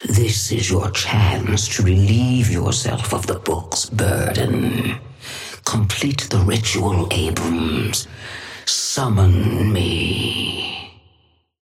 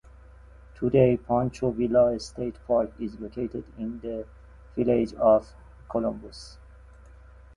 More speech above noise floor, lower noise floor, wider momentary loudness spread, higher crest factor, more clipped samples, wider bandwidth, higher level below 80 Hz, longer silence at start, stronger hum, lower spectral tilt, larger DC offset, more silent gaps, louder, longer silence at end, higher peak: first, 41 dB vs 24 dB; first, -59 dBFS vs -49 dBFS; second, 9 LU vs 16 LU; about the same, 16 dB vs 20 dB; neither; first, 16 kHz vs 11 kHz; first, -38 dBFS vs -48 dBFS; second, 0 s vs 0.75 s; neither; second, -4.5 dB/octave vs -8 dB/octave; neither; neither; first, -19 LUFS vs -26 LUFS; second, 0.75 s vs 1.05 s; about the same, -4 dBFS vs -6 dBFS